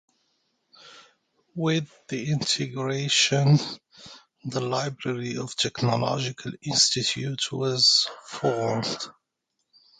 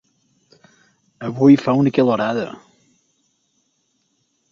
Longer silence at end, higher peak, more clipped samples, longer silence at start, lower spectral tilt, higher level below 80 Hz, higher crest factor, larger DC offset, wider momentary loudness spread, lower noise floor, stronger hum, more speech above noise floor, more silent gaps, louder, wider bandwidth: second, 0.9 s vs 1.95 s; second, -8 dBFS vs -2 dBFS; neither; second, 0.85 s vs 1.2 s; second, -3.5 dB/octave vs -8 dB/octave; about the same, -64 dBFS vs -62 dBFS; about the same, 20 dB vs 18 dB; neither; about the same, 15 LU vs 17 LU; first, -79 dBFS vs -67 dBFS; neither; about the same, 53 dB vs 52 dB; neither; second, -24 LUFS vs -16 LUFS; first, 9.6 kHz vs 7 kHz